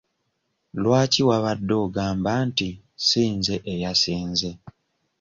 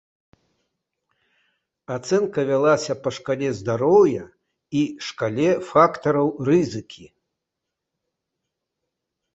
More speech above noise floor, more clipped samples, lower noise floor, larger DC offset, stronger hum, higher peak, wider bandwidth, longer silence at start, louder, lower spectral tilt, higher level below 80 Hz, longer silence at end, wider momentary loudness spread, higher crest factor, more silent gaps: second, 52 dB vs 62 dB; neither; second, -74 dBFS vs -83 dBFS; neither; neither; second, -6 dBFS vs -2 dBFS; about the same, 7.6 kHz vs 8 kHz; second, 0.75 s vs 1.9 s; about the same, -22 LUFS vs -21 LUFS; second, -4.5 dB/octave vs -6 dB/octave; first, -50 dBFS vs -62 dBFS; second, 0.5 s vs 2.3 s; second, 8 LU vs 11 LU; about the same, 18 dB vs 22 dB; neither